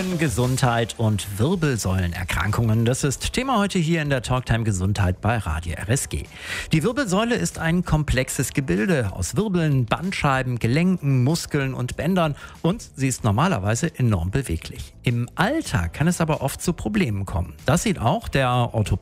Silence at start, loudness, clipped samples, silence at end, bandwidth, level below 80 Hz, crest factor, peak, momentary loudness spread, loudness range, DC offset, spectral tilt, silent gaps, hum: 0 s; -22 LUFS; under 0.1%; 0 s; 16 kHz; -38 dBFS; 16 dB; -4 dBFS; 5 LU; 2 LU; under 0.1%; -5.5 dB/octave; none; none